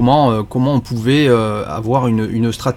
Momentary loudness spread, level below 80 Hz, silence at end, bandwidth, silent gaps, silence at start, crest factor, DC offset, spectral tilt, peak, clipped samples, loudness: 6 LU; -40 dBFS; 0 s; 15 kHz; none; 0 s; 14 dB; under 0.1%; -7 dB/octave; 0 dBFS; under 0.1%; -15 LUFS